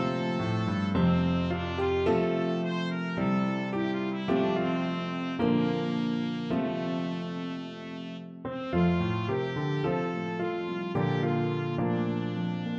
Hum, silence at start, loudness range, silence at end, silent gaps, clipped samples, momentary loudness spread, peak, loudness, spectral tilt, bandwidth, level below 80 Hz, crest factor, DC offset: none; 0 s; 3 LU; 0 s; none; under 0.1%; 8 LU; -14 dBFS; -29 LUFS; -8 dB/octave; 7.2 kHz; -54 dBFS; 14 dB; under 0.1%